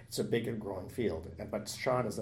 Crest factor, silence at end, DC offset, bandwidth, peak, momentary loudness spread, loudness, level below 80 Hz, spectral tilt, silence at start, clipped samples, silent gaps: 18 dB; 0 s; under 0.1%; 16.5 kHz; -18 dBFS; 8 LU; -36 LUFS; -62 dBFS; -5 dB/octave; 0 s; under 0.1%; none